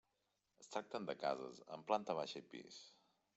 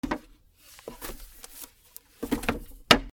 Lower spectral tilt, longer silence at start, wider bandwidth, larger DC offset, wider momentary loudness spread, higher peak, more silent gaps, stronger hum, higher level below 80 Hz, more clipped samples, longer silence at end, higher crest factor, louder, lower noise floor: about the same, -4 dB/octave vs -3 dB/octave; first, 0.6 s vs 0.05 s; second, 8.2 kHz vs over 20 kHz; neither; second, 17 LU vs 24 LU; second, -22 dBFS vs 0 dBFS; neither; neither; second, under -90 dBFS vs -46 dBFS; neither; first, 0.45 s vs 0 s; second, 24 dB vs 30 dB; second, -45 LUFS vs -29 LUFS; first, -86 dBFS vs -55 dBFS